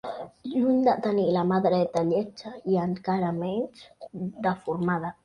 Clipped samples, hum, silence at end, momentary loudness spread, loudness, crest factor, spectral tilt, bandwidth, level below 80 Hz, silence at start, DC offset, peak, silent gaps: under 0.1%; none; 0.1 s; 14 LU; -26 LUFS; 16 dB; -8 dB/octave; 10 kHz; -64 dBFS; 0.05 s; under 0.1%; -10 dBFS; none